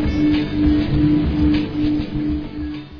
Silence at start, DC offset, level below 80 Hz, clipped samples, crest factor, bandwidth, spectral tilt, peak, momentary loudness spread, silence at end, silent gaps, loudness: 0 s; 0.5%; -28 dBFS; under 0.1%; 14 dB; 5.4 kHz; -9 dB/octave; -4 dBFS; 8 LU; 0 s; none; -19 LUFS